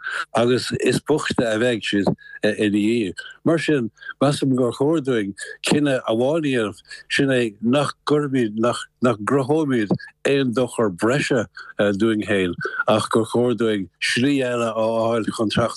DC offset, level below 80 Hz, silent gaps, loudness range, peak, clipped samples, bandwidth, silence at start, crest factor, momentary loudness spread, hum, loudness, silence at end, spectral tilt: under 0.1%; -58 dBFS; none; 1 LU; -6 dBFS; under 0.1%; 12.5 kHz; 0 s; 14 dB; 5 LU; none; -21 LUFS; 0 s; -5.5 dB/octave